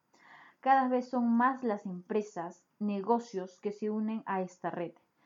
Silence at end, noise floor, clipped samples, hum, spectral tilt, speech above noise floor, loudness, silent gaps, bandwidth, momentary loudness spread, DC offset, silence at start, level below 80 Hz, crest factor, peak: 0.35 s; -58 dBFS; under 0.1%; none; -7 dB/octave; 26 dB; -33 LUFS; none; 7.6 kHz; 13 LU; under 0.1%; 0.3 s; under -90 dBFS; 18 dB; -14 dBFS